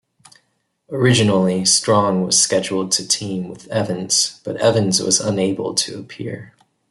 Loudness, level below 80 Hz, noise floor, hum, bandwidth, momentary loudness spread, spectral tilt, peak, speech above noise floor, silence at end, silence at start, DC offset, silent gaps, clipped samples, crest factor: -17 LUFS; -60 dBFS; -67 dBFS; none; 12 kHz; 14 LU; -3.5 dB/octave; -2 dBFS; 49 dB; 0.45 s; 0.9 s; under 0.1%; none; under 0.1%; 18 dB